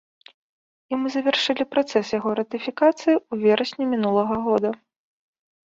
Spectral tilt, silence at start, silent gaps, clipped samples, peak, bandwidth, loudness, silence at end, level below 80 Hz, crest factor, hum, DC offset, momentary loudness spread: -5 dB/octave; 0.9 s; none; under 0.1%; -6 dBFS; 7.8 kHz; -22 LUFS; 0.9 s; -64 dBFS; 18 dB; none; under 0.1%; 7 LU